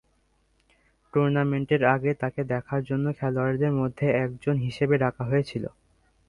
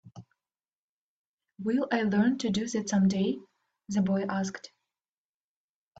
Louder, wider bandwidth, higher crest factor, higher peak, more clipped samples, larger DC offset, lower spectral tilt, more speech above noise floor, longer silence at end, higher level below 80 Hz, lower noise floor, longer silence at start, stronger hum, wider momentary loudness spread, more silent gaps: first, -26 LUFS vs -29 LUFS; first, 10.5 kHz vs 8 kHz; about the same, 20 dB vs 18 dB; first, -6 dBFS vs -12 dBFS; neither; neither; first, -9 dB/octave vs -6 dB/octave; second, 43 dB vs over 62 dB; second, 0.6 s vs 1.35 s; first, -56 dBFS vs -68 dBFS; second, -67 dBFS vs under -90 dBFS; first, 1.15 s vs 0.05 s; neither; second, 6 LU vs 11 LU; second, none vs 0.75-1.38 s